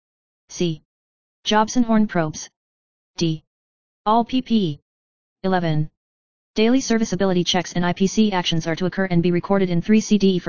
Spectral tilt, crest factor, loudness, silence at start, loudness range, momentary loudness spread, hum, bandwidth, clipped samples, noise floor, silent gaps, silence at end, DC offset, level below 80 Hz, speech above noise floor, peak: -5.5 dB/octave; 18 dB; -20 LUFS; 0.45 s; 4 LU; 11 LU; none; 7.2 kHz; under 0.1%; under -90 dBFS; 0.85-1.43 s, 2.56-3.14 s, 3.47-4.05 s, 4.82-5.36 s, 5.97-6.54 s; 0 s; 2%; -50 dBFS; over 71 dB; -4 dBFS